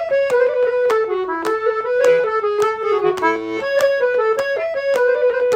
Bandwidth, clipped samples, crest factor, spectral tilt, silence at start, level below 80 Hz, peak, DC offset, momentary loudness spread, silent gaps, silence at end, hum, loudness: 15.5 kHz; under 0.1%; 16 dB; -3.5 dB/octave; 0 s; -60 dBFS; -2 dBFS; under 0.1%; 5 LU; none; 0 s; none; -17 LUFS